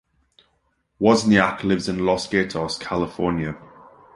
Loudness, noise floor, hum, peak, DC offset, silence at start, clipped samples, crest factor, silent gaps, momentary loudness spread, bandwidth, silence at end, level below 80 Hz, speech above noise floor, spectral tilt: -21 LUFS; -69 dBFS; none; -2 dBFS; under 0.1%; 1 s; under 0.1%; 20 dB; none; 10 LU; 11.5 kHz; 0.5 s; -48 dBFS; 48 dB; -5.5 dB/octave